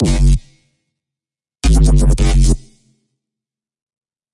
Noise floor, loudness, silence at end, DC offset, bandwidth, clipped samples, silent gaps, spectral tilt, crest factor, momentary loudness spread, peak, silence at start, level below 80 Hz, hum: -90 dBFS; -15 LUFS; 1.75 s; under 0.1%; 11.5 kHz; under 0.1%; none; -6 dB/octave; 14 dB; 8 LU; -2 dBFS; 0 s; -16 dBFS; none